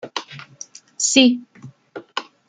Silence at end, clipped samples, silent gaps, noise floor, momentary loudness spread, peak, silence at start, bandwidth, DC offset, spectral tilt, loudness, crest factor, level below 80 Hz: 0.25 s; under 0.1%; none; -42 dBFS; 25 LU; -2 dBFS; 0.05 s; 9.6 kHz; under 0.1%; -1.5 dB/octave; -18 LUFS; 20 dB; -68 dBFS